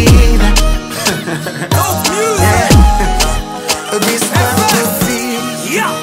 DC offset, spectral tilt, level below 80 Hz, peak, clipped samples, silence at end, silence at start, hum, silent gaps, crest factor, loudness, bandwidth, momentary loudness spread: under 0.1%; -4 dB/octave; -16 dBFS; 0 dBFS; under 0.1%; 0 s; 0 s; none; none; 10 dB; -12 LUFS; 16.5 kHz; 8 LU